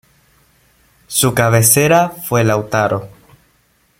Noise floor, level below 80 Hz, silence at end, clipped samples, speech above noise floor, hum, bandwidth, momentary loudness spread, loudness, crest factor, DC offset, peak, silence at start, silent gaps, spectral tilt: -57 dBFS; -50 dBFS; 0.95 s; under 0.1%; 44 dB; none; 16.5 kHz; 9 LU; -13 LUFS; 16 dB; under 0.1%; 0 dBFS; 1.1 s; none; -4 dB/octave